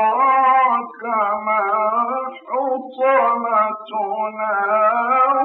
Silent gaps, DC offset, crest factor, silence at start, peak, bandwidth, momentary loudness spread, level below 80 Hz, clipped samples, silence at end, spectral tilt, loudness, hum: none; under 0.1%; 12 dB; 0 s; -6 dBFS; 4.2 kHz; 9 LU; -80 dBFS; under 0.1%; 0 s; -8 dB/octave; -18 LUFS; none